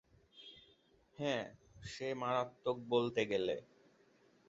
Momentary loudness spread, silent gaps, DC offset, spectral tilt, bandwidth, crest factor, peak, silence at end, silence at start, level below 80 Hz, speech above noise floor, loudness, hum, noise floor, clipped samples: 20 LU; none; under 0.1%; -3.5 dB/octave; 7.6 kHz; 20 dB; -20 dBFS; 0.85 s; 0.35 s; -72 dBFS; 32 dB; -39 LUFS; none; -70 dBFS; under 0.1%